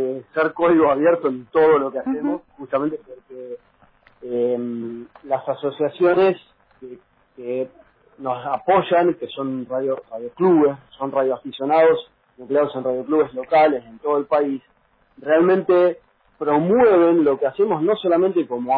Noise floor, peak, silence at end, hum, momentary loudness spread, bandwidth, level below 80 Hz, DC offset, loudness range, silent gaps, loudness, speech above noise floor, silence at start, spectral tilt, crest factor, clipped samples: -56 dBFS; -6 dBFS; 0 s; none; 15 LU; 4.9 kHz; -62 dBFS; under 0.1%; 6 LU; none; -19 LUFS; 37 dB; 0 s; -10 dB/octave; 14 dB; under 0.1%